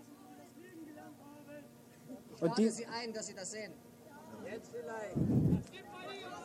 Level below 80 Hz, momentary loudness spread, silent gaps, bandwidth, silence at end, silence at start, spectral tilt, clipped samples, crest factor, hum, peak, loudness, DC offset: -60 dBFS; 23 LU; none; 16 kHz; 0 s; 0 s; -6 dB/octave; under 0.1%; 20 dB; none; -20 dBFS; -38 LUFS; under 0.1%